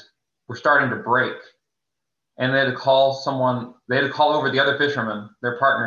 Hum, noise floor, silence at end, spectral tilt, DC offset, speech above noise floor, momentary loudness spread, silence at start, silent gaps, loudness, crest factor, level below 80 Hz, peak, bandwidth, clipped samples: none; -83 dBFS; 0 s; -6 dB/octave; under 0.1%; 63 dB; 10 LU; 0.5 s; none; -20 LUFS; 16 dB; -68 dBFS; -6 dBFS; 7.2 kHz; under 0.1%